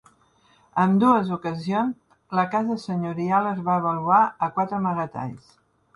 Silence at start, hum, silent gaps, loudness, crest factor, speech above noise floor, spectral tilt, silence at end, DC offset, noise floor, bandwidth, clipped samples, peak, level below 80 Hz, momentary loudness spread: 0.75 s; none; none; -23 LUFS; 18 dB; 37 dB; -8 dB/octave; 0.6 s; under 0.1%; -60 dBFS; 11 kHz; under 0.1%; -6 dBFS; -64 dBFS; 10 LU